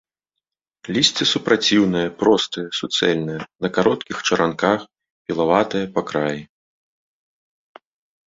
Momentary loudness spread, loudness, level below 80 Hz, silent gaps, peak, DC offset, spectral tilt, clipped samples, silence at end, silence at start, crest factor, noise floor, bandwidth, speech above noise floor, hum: 10 LU; -19 LUFS; -58 dBFS; 5.11-5.25 s; -2 dBFS; under 0.1%; -4 dB/octave; under 0.1%; 1.8 s; 0.85 s; 20 dB; -84 dBFS; 8 kHz; 64 dB; none